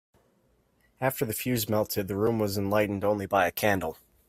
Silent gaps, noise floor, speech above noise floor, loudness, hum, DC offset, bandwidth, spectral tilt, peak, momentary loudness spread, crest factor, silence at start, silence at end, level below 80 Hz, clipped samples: none; -68 dBFS; 41 dB; -28 LUFS; none; under 0.1%; 16 kHz; -5 dB/octave; -10 dBFS; 5 LU; 20 dB; 1 s; 0.35 s; -60 dBFS; under 0.1%